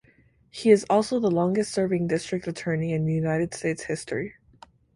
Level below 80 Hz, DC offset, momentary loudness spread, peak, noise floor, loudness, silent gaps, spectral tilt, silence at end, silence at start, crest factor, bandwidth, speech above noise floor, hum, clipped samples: -58 dBFS; under 0.1%; 10 LU; -6 dBFS; -60 dBFS; -25 LUFS; none; -6 dB/octave; 0.65 s; 0.55 s; 20 dB; 11.5 kHz; 36 dB; none; under 0.1%